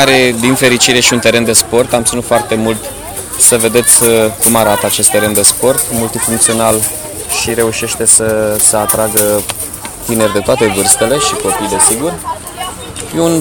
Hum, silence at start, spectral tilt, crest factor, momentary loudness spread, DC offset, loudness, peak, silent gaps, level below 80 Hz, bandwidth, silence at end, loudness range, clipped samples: none; 0 s; -2.5 dB/octave; 12 dB; 13 LU; under 0.1%; -9 LUFS; 0 dBFS; none; -38 dBFS; over 20 kHz; 0 s; 3 LU; 0.2%